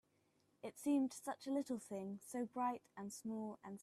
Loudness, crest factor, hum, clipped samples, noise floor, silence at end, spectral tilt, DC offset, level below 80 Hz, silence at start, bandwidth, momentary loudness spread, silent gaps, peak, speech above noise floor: -44 LUFS; 16 dB; none; under 0.1%; -79 dBFS; 0 s; -5 dB/octave; under 0.1%; -86 dBFS; 0.65 s; 14.5 kHz; 11 LU; none; -28 dBFS; 36 dB